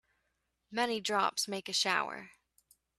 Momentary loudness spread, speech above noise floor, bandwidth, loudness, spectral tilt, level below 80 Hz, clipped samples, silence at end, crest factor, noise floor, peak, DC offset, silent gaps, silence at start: 11 LU; 48 dB; 14 kHz; -32 LUFS; -1.5 dB/octave; -80 dBFS; under 0.1%; 0.7 s; 22 dB; -81 dBFS; -14 dBFS; under 0.1%; none; 0.7 s